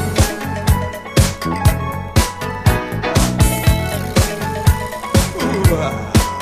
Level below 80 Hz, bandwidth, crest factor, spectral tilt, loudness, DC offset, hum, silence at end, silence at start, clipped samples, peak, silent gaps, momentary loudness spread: -24 dBFS; 15.5 kHz; 16 dB; -5 dB/octave; -17 LUFS; under 0.1%; none; 0 s; 0 s; under 0.1%; 0 dBFS; none; 4 LU